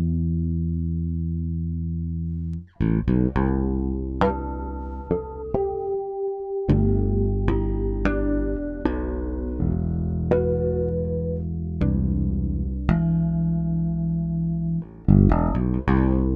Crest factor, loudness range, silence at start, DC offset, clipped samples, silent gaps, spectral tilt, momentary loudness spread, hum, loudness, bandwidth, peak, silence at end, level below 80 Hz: 20 dB; 3 LU; 0 s; under 0.1%; under 0.1%; none; -11 dB/octave; 8 LU; none; -24 LUFS; 5 kHz; -2 dBFS; 0 s; -30 dBFS